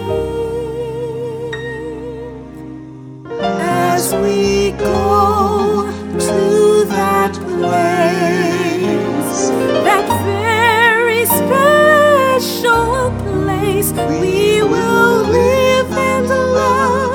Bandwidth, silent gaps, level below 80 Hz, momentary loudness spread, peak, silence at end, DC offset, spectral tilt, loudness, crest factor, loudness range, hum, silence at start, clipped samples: 19.5 kHz; none; -38 dBFS; 13 LU; 0 dBFS; 0 s; under 0.1%; -4.5 dB/octave; -14 LUFS; 14 dB; 8 LU; none; 0 s; under 0.1%